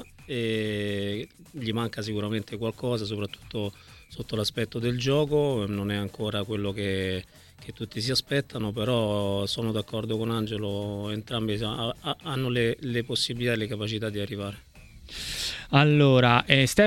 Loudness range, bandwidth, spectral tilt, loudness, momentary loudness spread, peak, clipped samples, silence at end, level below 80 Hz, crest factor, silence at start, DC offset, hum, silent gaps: 5 LU; 17 kHz; -5.5 dB/octave; -27 LUFS; 14 LU; 0 dBFS; under 0.1%; 0 s; -52 dBFS; 26 dB; 0 s; under 0.1%; none; none